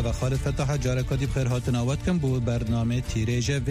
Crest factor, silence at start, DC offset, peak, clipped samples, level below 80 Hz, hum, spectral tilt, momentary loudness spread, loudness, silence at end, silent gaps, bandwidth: 10 dB; 0 s; under 0.1%; -14 dBFS; under 0.1%; -36 dBFS; none; -6.5 dB/octave; 2 LU; -26 LUFS; 0 s; none; 15 kHz